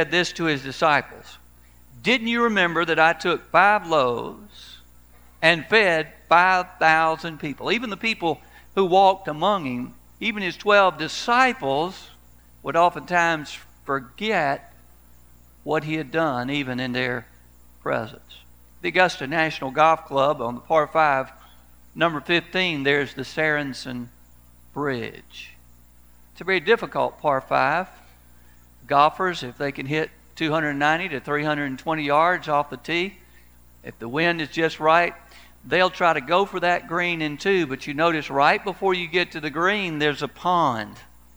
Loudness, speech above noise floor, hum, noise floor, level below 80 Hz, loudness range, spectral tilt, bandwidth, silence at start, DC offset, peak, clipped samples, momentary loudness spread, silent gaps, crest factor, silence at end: -22 LUFS; 31 dB; 60 Hz at -55 dBFS; -53 dBFS; -54 dBFS; 6 LU; -5 dB/octave; over 20 kHz; 0 s; 0.2%; 0 dBFS; under 0.1%; 13 LU; none; 22 dB; 0.35 s